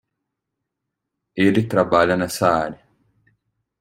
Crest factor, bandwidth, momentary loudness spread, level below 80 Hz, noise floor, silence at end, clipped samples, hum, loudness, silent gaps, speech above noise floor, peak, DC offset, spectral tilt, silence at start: 20 dB; 16.5 kHz; 9 LU; -56 dBFS; -81 dBFS; 1.05 s; under 0.1%; none; -19 LUFS; none; 63 dB; -2 dBFS; under 0.1%; -5.5 dB/octave; 1.35 s